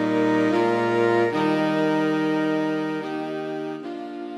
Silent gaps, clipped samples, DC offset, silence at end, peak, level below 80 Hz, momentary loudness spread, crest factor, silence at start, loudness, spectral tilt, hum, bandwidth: none; under 0.1%; under 0.1%; 0 s; -8 dBFS; -74 dBFS; 10 LU; 14 dB; 0 s; -23 LUFS; -6.5 dB/octave; none; 11 kHz